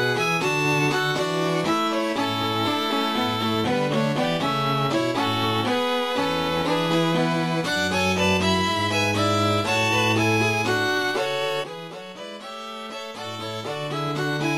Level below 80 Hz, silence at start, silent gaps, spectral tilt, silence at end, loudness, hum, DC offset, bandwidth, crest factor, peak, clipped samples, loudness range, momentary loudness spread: -56 dBFS; 0 s; none; -4.5 dB/octave; 0 s; -22 LUFS; none; under 0.1%; 16 kHz; 14 dB; -10 dBFS; under 0.1%; 5 LU; 12 LU